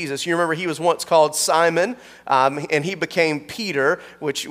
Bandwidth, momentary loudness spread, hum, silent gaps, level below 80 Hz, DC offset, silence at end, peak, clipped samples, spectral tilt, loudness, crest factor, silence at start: 16 kHz; 8 LU; none; none; -66 dBFS; under 0.1%; 0 s; -4 dBFS; under 0.1%; -3.5 dB/octave; -20 LUFS; 16 dB; 0 s